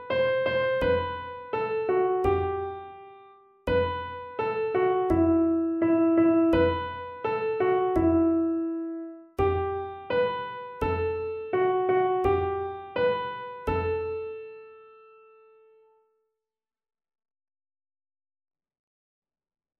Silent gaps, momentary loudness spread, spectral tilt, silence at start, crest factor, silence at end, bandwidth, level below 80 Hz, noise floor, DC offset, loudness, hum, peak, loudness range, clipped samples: none; 13 LU; -8.5 dB/octave; 0 s; 16 dB; 4.95 s; 5.2 kHz; -48 dBFS; under -90 dBFS; under 0.1%; -26 LUFS; none; -12 dBFS; 8 LU; under 0.1%